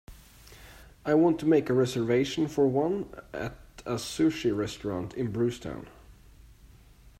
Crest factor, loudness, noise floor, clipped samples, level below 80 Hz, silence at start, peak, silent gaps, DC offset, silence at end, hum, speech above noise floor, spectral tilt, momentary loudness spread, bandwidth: 18 dB; -28 LUFS; -54 dBFS; under 0.1%; -54 dBFS; 0.1 s; -12 dBFS; none; under 0.1%; 0.55 s; none; 27 dB; -6 dB/octave; 15 LU; 15.5 kHz